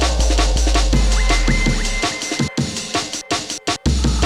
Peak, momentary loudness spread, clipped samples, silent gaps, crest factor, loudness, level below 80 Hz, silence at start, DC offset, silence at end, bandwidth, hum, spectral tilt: -4 dBFS; 5 LU; under 0.1%; none; 14 dB; -19 LUFS; -18 dBFS; 0 s; under 0.1%; 0 s; 12.5 kHz; none; -4 dB/octave